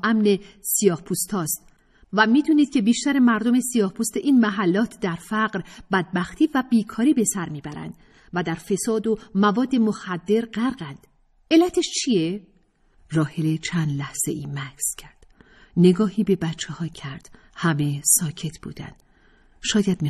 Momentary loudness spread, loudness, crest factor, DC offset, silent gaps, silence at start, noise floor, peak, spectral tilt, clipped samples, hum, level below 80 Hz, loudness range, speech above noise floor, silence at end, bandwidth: 14 LU; -22 LUFS; 20 dB; under 0.1%; none; 0.05 s; -59 dBFS; -2 dBFS; -4.5 dB/octave; under 0.1%; none; -54 dBFS; 4 LU; 37 dB; 0 s; 14 kHz